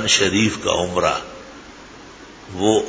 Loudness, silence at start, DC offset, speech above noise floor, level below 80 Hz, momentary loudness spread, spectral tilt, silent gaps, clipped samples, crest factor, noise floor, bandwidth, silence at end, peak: -19 LUFS; 0 s; under 0.1%; 22 dB; -44 dBFS; 24 LU; -3 dB/octave; none; under 0.1%; 20 dB; -40 dBFS; 8 kHz; 0 s; -2 dBFS